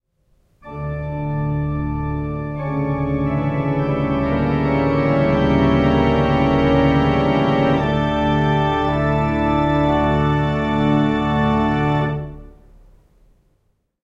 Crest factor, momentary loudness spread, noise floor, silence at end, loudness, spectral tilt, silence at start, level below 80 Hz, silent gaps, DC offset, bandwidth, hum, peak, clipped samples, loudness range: 14 dB; 8 LU; -65 dBFS; 1.55 s; -18 LUFS; -8.5 dB/octave; 0.65 s; -32 dBFS; none; under 0.1%; 7.4 kHz; none; -4 dBFS; under 0.1%; 6 LU